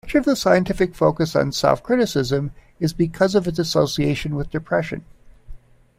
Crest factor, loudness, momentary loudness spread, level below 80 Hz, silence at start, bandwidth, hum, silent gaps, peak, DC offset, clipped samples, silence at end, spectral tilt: 18 dB; -20 LUFS; 8 LU; -42 dBFS; 0.05 s; 16 kHz; none; none; -2 dBFS; under 0.1%; under 0.1%; 0.4 s; -5.5 dB/octave